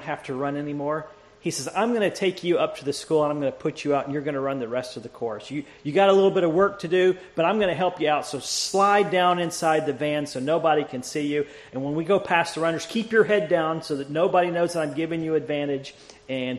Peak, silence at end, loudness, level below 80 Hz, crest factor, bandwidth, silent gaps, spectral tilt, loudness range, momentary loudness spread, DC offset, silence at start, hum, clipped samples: -6 dBFS; 0 s; -24 LUFS; -64 dBFS; 18 dB; 13 kHz; none; -4.5 dB/octave; 4 LU; 10 LU; under 0.1%; 0 s; none; under 0.1%